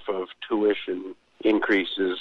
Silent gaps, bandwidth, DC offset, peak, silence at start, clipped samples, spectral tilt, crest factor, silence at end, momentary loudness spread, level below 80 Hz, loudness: none; 6.2 kHz; under 0.1%; -10 dBFS; 0 s; under 0.1%; -6 dB/octave; 16 dB; 0 s; 11 LU; -66 dBFS; -25 LUFS